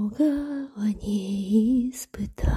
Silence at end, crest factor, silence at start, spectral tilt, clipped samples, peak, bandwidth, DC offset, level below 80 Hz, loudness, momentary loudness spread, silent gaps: 0 s; 14 dB; 0 s; -7 dB/octave; under 0.1%; -10 dBFS; 15 kHz; under 0.1%; -36 dBFS; -26 LUFS; 11 LU; none